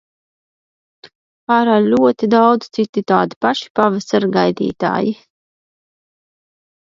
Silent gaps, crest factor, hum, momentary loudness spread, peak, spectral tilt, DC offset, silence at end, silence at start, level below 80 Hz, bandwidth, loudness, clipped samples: 1.15-1.47 s, 2.89-2.93 s, 3.36-3.41 s, 3.70-3.75 s; 18 dB; none; 7 LU; 0 dBFS; -6.5 dB/octave; under 0.1%; 1.8 s; 1.05 s; -60 dBFS; 7.6 kHz; -15 LUFS; under 0.1%